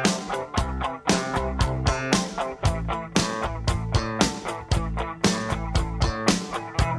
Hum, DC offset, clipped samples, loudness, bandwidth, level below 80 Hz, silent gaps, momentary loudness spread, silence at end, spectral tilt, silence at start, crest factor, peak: none; under 0.1%; under 0.1%; -26 LUFS; 11 kHz; -32 dBFS; none; 5 LU; 0 s; -4.5 dB/octave; 0 s; 24 dB; -2 dBFS